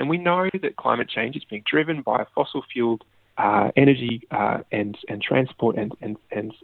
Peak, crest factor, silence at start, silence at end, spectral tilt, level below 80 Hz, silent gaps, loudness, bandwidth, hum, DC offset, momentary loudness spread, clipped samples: -2 dBFS; 22 dB; 0 s; 0.1 s; -9.5 dB/octave; -62 dBFS; none; -23 LUFS; 4.4 kHz; none; under 0.1%; 12 LU; under 0.1%